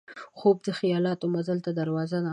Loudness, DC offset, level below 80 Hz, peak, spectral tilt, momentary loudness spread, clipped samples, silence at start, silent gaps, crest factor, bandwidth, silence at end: -27 LUFS; under 0.1%; -74 dBFS; -10 dBFS; -7.5 dB/octave; 5 LU; under 0.1%; 0.1 s; none; 16 dB; 10 kHz; 0 s